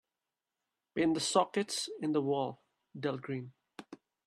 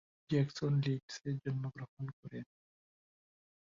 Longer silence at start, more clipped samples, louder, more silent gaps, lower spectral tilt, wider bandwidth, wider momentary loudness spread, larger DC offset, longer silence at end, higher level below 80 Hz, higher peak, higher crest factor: first, 0.95 s vs 0.3 s; neither; first, -34 LUFS vs -38 LUFS; second, none vs 1.03-1.08 s, 1.88-1.97 s, 2.13-2.23 s; second, -4 dB/octave vs -7.5 dB/octave; first, 13 kHz vs 7.4 kHz; first, 22 LU vs 15 LU; neither; second, 0.3 s vs 1.2 s; second, -78 dBFS vs -72 dBFS; first, -14 dBFS vs -22 dBFS; about the same, 22 dB vs 18 dB